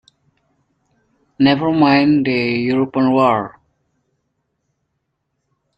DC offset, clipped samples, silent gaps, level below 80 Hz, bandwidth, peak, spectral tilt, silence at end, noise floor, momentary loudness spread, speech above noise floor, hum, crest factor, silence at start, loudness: under 0.1%; under 0.1%; none; -56 dBFS; 5.4 kHz; -2 dBFS; -8 dB/octave; 2.3 s; -72 dBFS; 5 LU; 58 dB; none; 18 dB; 1.4 s; -15 LUFS